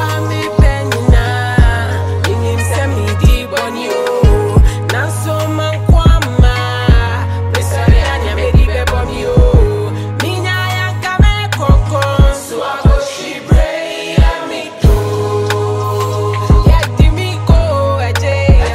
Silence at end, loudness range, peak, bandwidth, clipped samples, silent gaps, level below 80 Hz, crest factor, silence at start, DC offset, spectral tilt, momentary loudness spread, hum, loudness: 0 s; 2 LU; 0 dBFS; 15 kHz; under 0.1%; none; -14 dBFS; 10 dB; 0 s; under 0.1%; -6 dB/octave; 6 LU; none; -13 LUFS